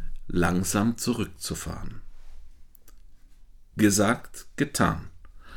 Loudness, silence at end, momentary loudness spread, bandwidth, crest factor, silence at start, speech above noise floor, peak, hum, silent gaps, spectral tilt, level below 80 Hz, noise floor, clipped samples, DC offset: -26 LUFS; 0 s; 16 LU; 19 kHz; 22 dB; 0 s; 23 dB; -6 dBFS; none; none; -4.5 dB/octave; -40 dBFS; -49 dBFS; under 0.1%; under 0.1%